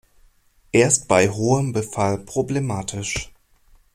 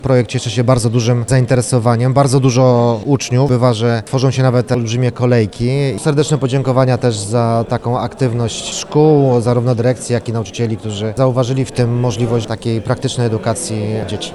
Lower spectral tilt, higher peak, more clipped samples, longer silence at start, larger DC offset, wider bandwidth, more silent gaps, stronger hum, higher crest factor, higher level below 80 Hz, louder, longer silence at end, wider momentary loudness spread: second, -4.5 dB/octave vs -6.5 dB/octave; about the same, -2 dBFS vs 0 dBFS; neither; first, 0.75 s vs 0 s; neither; first, 15 kHz vs 12 kHz; neither; neither; first, 20 dB vs 12 dB; second, -48 dBFS vs -42 dBFS; second, -21 LUFS vs -15 LUFS; first, 0.7 s vs 0 s; first, 10 LU vs 7 LU